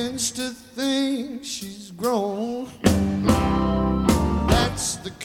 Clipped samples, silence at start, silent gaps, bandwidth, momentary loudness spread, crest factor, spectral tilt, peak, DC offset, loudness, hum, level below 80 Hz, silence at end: under 0.1%; 0 s; none; 17.5 kHz; 10 LU; 20 dB; -5 dB/octave; -4 dBFS; under 0.1%; -23 LUFS; none; -32 dBFS; 0 s